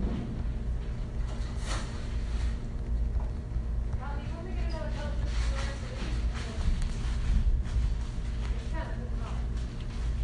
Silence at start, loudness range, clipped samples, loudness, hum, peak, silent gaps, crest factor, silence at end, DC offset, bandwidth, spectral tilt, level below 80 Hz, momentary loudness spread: 0 s; 2 LU; under 0.1%; -34 LUFS; none; -14 dBFS; none; 16 dB; 0 s; under 0.1%; 10.5 kHz; -6 dB/octave; -32 dBFS; 5 LU